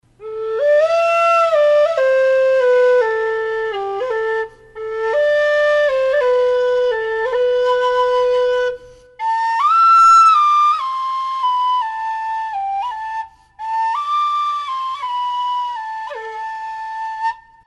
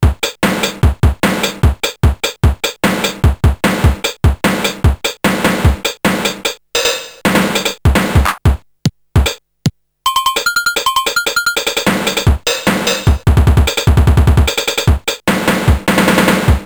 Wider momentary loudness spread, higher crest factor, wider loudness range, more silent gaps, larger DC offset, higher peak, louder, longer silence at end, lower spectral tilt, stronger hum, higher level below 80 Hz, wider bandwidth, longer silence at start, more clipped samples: first, 14 LU vs 5 LU; about the same, 12 dB vs 12 dB; first, 8 LU vs 3 LU; neither; neither; second, -4 dBFS vs 0 dBFS; about the same, -16 LUFS vs -14 LUFS; first, 0.3 s vs 0 s; second, -1.5 dB/octave vs -4.5 dB/octave; neither; second, -56 dBFS vs -18 dBFS; second, 11.5 kHz vs over 20 kHz; first, 0.2 s vs 0 s; neither